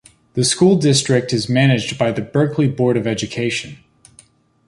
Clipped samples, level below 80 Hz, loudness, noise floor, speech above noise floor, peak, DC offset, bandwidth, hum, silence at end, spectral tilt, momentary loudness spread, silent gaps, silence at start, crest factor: under 0.1%; -52 dBFS; -17 LUFS; -51 dBFS; 35 dB; -2 dBFS; under 0.1%; 11.5 kHz; none; 0.95 s; -5 dB/octave; 8 LU; none; 0.35 s; 16 dB